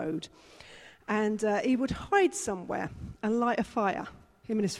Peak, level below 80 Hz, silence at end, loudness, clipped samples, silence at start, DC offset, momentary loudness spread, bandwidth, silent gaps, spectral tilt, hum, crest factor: -12 dBFS; -56 dBFS; 0 s; -30 LUFS; under 0.1%; 0 s; under 0.1%; 21 LU; 14 kHz; none; -5 dB/octave; none; 18 dB